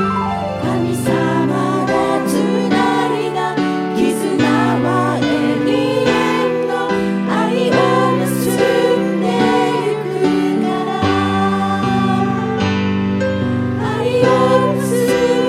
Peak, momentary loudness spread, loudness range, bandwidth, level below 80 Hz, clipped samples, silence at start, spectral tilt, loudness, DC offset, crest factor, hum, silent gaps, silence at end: 0 dBFS; 5 LU; 1 LU; 16 kHz; -48 dBFS; under 0.1%; 0 s; -6 dB/octave; -16 LUFS; under 0.1%; 14 dB; none; none; 0 s